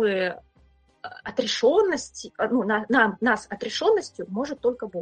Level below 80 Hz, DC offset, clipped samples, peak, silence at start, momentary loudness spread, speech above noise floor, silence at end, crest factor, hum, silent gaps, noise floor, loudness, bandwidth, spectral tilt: -62 dBFS; under 0.1%; under 0.1%; -4 dBFS; 0 s; 15 LU; 35 dB; 0 s; 20 dB; none; none; -60 dBFS; -24 LUFS; 9.4 kHz; -4 dB/octave